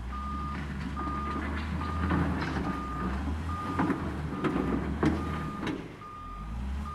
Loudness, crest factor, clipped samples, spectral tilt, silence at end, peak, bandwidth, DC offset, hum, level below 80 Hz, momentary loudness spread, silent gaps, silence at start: -33 LUFS; 20 dB; under 0.1%; -7.5 dB/octave; 0 s; -12 dBFS; 12 kHz; under 0.1%; none; -38 dBFS; 9 LU; none; 0 s